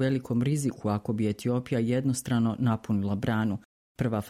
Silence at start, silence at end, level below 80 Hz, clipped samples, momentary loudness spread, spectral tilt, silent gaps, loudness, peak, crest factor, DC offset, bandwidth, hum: 0 s; 0 s; -58 dBFS; under 0.1%; 4 LU; -7 dB/octave; 3.65-3.95 s; -28 LUFS; -14 dBFS; 14 dB; under 0.1%; 15 kHz; none